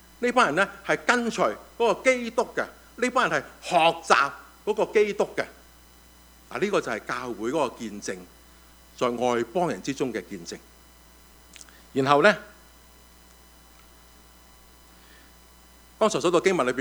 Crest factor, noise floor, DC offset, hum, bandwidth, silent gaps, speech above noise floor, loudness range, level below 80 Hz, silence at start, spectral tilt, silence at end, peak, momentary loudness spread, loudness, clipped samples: 26 dB; -53 dBFS; under 0.1%; none; over 20 kHz; none; 28 dB; 6 LU; -58 dBFS; 0.2 s; -4 dB/octave; 0 s; 0 dBFS; 14 LU; -25 LUFS; under 0.1%